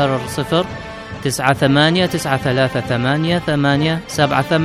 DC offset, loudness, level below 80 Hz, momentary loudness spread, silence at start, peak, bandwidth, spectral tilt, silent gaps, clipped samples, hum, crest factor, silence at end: under 0.1%; -17 LUFS; -44 dBFS; 9 LU; 0 s; -2 dBFS; 15 kHz; -5.5 dB/octave; none; under 0.1%; none; 16 dB; 0 s